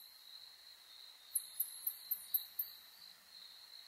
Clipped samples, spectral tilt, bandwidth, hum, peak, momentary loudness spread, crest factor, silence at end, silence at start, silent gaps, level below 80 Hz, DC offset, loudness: under 0.1%; 3.5 dB/octave; 16 kHz; none; -22 dBFS; 18 LU; 24 dB; 0 s; 0 s; none; under -90 dBFS; under 0.1%; -40 LUFS